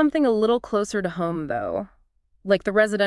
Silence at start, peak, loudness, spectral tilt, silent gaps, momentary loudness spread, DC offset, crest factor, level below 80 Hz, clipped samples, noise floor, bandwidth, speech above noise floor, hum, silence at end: 0 s; -6 dBFS; -23 LUFS; -5.5 dB/octave; none; 11 LU; under 0.1%; 18 dB; -54 dBFS; under 0.1%; -54 dBFS; 12 kHz; 32 dB; none; 0 s